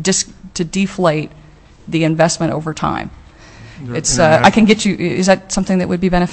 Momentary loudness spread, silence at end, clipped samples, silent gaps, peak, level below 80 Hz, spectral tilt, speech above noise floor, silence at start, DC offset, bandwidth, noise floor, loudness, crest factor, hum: 14 LU; 0 s; under 0.1%; none; 0 dBFS; -36 dBFS; -4.5 dB/octave; 24 dB; 0 s; under 0.1%; 8.8 kHz; -38 dBFS; -15 LUFS; 16 dB; none